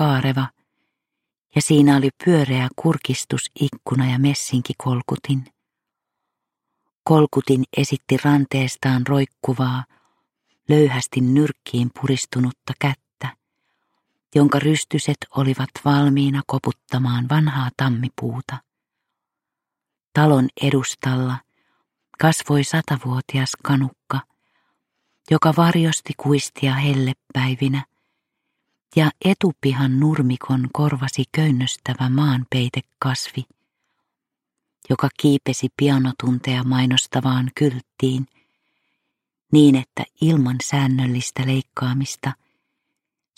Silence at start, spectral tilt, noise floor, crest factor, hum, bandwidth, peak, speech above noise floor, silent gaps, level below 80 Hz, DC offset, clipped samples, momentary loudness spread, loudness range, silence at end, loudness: 0 s; -6 dB/octave; -85 dBFS; 18 dB; none; 15 kHz; -2 dBFS; 66 dB; 6.97-7.02 s, 20.07-20.12 s; -60 dBFS; under 0.1%; under 0.1%; 9 LU; 4 LU; 1.05 s; -20 LUFS